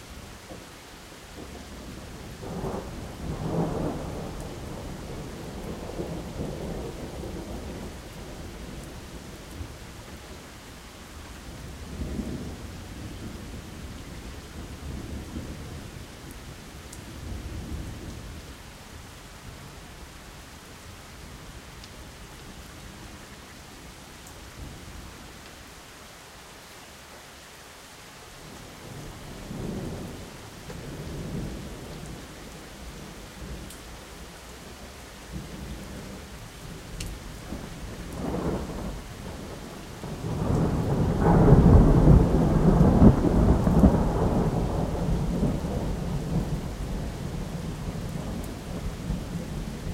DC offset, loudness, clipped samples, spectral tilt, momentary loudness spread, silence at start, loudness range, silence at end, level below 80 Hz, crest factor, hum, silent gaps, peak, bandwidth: under 0.1%; -28 LUFS; under 0.1%; -7 dB/octave; 22 LU; 0 s; 22 LU; 0 s; -34 dBFS; 26 dB; none; none; -4 dBFS; 16 kHz